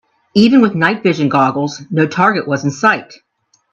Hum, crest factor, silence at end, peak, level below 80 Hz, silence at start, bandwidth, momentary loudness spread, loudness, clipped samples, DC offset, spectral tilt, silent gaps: none; 14 dB; 0.55 s; 0 dBFS; -58 dBFS; 0.35 s; 8.2 kHz; 8 LU; -13 LUFS; under 0.1%; under 0.1%; -6 dB/octave; none